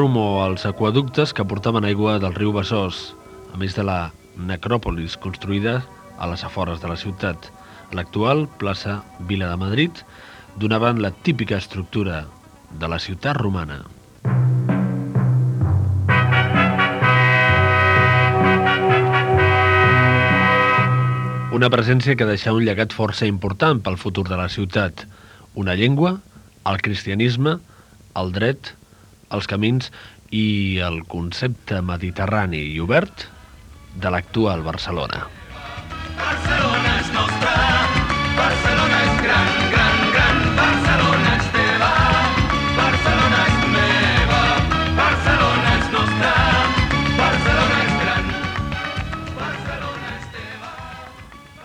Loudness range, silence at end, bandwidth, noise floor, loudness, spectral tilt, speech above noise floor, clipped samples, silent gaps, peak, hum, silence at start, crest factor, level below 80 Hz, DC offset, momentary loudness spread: 10 LU; 0 s; 11 kHz; -49 dBFS; -18 LUFS; -6 dB/octave; 28 dB; under 0.1%; none; 0 dBFS; none; 0 s; 18 dB; -34 dBFS; under 0.1%; 14 LU